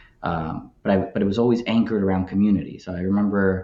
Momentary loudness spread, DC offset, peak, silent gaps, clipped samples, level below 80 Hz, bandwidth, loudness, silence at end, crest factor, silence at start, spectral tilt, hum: 9 LU; under 0.1%; -6 dBFS; none; under 0.1%; -48 dBFS; 7.2 kHz; -22 LUFS; 0 s; 16 dB; 0.2 s; -8.5 dB/octave; none